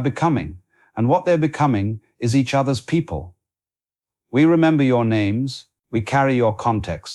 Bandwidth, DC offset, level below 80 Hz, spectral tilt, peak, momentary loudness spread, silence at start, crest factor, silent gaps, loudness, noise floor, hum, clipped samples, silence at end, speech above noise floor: 12 kHz; under 0.1%; -48 dBFS; -7 dB/octave; -6 dBFS; 11 LU; 0 s; 14 dB; none; -19 LUFS; under -90 dBFS; none; under 0.1%; 0 s; over 71 dB